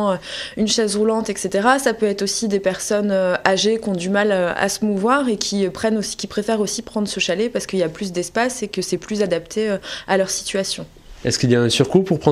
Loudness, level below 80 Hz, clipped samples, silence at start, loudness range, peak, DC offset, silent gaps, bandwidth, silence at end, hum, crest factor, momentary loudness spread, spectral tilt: -20 LUFS; -50 dBFS; under 0.1%; 0 s; 3 LU; 0 dBFS; under 0.1%; none; 15 kHz; 0 s; none; 20 dB; 7 LU; -4 dB/octave